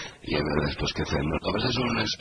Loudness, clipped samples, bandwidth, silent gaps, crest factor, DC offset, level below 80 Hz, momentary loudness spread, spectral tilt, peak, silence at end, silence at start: -27 LUFS; under 0.1%; 10.5 kHz; none; 20 dB; under 0.1%; -40 dBFS; 3 LU; -5 dB/octave; -8 dBFS; 0.05 s; 0 s